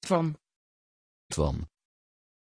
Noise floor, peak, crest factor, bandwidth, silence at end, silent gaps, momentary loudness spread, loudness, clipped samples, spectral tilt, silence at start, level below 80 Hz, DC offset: under -90 dBFS; -12 dBFS; 22 dB; 10.5 kHz; 0.9 s; 0.56-1.30 s; 17 LU; -31 LUFS; under 0.1%; -6 dB/octave; 0 s; -44 dBFS; under 0.1%